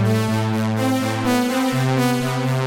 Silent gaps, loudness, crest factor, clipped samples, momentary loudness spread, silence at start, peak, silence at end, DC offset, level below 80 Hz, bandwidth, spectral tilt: none; -20 LUFS; 14 dB; under 0.1%; 2 LU; 0 s; -4 dBFS; 0 s; under 0.1%; -52 dBFS; 17 kHz; -6 dB/octave